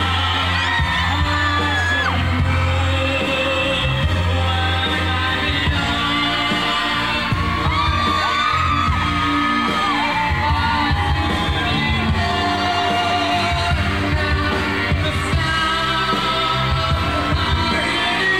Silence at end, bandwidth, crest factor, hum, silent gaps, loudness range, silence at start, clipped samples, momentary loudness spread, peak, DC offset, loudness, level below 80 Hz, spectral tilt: 0 s; 14.5 kHz; 10 dB; none; none; 1 LU; 0 s; under 0.1%; 2 LU; -8 dBFS; 0.5%; -18 LUFS; -30 dBFS; -5 dB/octave